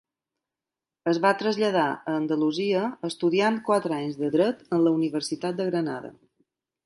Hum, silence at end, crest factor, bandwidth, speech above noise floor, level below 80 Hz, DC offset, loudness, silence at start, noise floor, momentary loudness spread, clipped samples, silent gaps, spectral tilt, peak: none; 0.75 s; 18 dB; 11.5 kHz; 65 dB; -74 dBFS; under 0.1%; -25 LUFS; 1.05 s; -90 dBFS; 7 LU; under 0.1%; none; -5.5 dB/octave; -8 dBFS